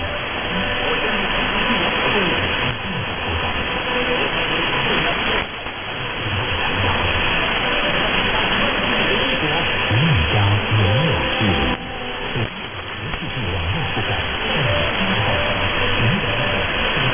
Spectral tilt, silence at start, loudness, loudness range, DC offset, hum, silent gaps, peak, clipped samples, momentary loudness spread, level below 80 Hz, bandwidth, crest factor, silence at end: -9 dB/octave; 0 s; -19 LUFS; 4 LU; 0.2%; none; none; -6 dBFS; under 0.1%; 7 LU; -32 dBFS; 3.6 kHz; 14 dB; 0 s